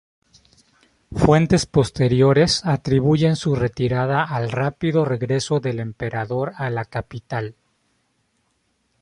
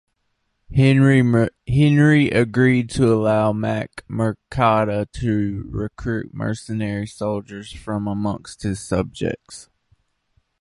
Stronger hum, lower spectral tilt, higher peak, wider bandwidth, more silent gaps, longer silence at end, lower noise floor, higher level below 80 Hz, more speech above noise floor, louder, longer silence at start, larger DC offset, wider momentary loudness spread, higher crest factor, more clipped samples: neither; about the same, -6 dB/octave vs -7 dB/octave; about the same, -2 dBFS vs -2 dBFS; about the same, 11.5 kHz vs 11.5 kHz; neither; first, 1.5 s vs 1 s; about the same, -68 dBFS vs -71 dBFS; about the same, -44 dBFS vs -42 dBFS; about the same, 49 dB vs 52 dB; about the same, -20 LUFS vs -20 LUFS; first, 1.1 s vs 0.7 s; neither; about the same, 12 LU vs 13 LU; about the same, 18 dB vs 18 dB; neither